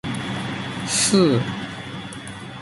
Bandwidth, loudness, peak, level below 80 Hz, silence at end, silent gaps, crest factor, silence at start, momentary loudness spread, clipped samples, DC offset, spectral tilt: 11.5 kHz; -21 LUFS; -4 dBFS; -52 dBFS; 0 s; none; 18 dB; 0.05 s; 17 LU; under 0.1%; under 0.1%; -4 dB/octave